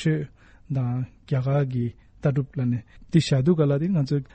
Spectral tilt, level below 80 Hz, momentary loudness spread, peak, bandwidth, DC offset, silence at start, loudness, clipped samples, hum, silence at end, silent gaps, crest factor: -8 dB/octave; -52 dBFS; 10 LU; -6 dBFS; 8.4 kHz; under 0.1%; 0 s; -25 LUFS; under 0.1%; none; 0.1 s; none; 16 dB